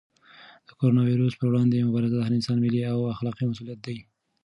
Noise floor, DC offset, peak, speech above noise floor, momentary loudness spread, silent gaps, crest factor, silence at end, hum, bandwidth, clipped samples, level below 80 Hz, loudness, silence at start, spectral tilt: -52 dBFS; under 0.1%; -10 dBFS; 28 dB; 14 LU; none; 14 dB; 0.45 s; none; 10.5 kHz; under 0.1%; -62 dBFS; -25 LUFS; 0.8 s; -8.5 dB/octave